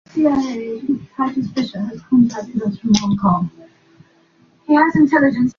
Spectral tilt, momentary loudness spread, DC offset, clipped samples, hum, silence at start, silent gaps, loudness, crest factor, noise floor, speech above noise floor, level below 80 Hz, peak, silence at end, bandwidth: -6 dB/octave; 11 LU; under 0.1%; under 0.1%; none; 0.15 s; none; -17 LUFS; 16 dB; -54 dBFS; 37 dB; -52 dBFS; -2 dBFS; 0.05 s; 7.2 kHz